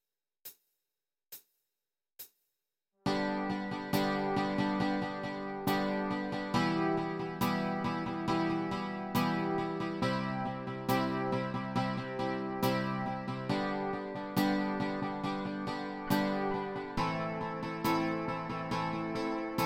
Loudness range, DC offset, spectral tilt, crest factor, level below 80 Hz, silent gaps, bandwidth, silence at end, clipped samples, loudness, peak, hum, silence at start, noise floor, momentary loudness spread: 2 LU; under 0.1%; -6 dB/octave; 18 dB; -62 dBFS; none; 16.5 kHz; 0 s; under 0.1%; -34 LUFS; -16 dBFS; none; 0.45 s; under -90 dBFS; 6 LU